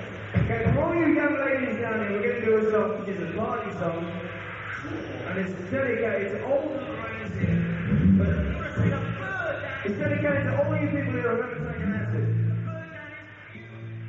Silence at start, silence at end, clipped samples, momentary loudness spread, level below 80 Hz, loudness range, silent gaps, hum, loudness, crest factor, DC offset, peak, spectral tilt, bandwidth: 0 s; 0 s; under 0.1%; 12 LU; -44 dBFS; 5 LU; none; none; -27 LUFS; 16 dB; under 0.1%; -10 dBFS; -7 dB/octave; 7.4 kHz